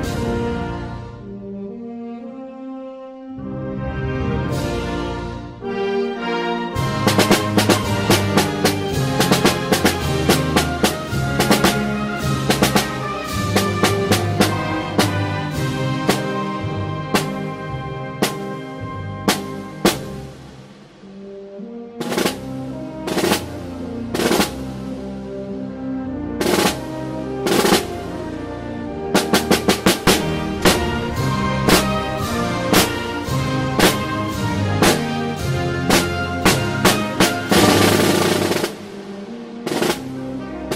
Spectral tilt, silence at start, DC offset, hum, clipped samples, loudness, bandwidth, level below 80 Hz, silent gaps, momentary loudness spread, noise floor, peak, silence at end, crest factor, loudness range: -4.5 dB/octave; 0 s; under 0.1%; none; under 0.1%; -19 LUFS; 16.5 kHz; -38 dBFS; none; 16 LU; -41 dBFS; 0 dBFS; 0 s; 20 dB; 9 LU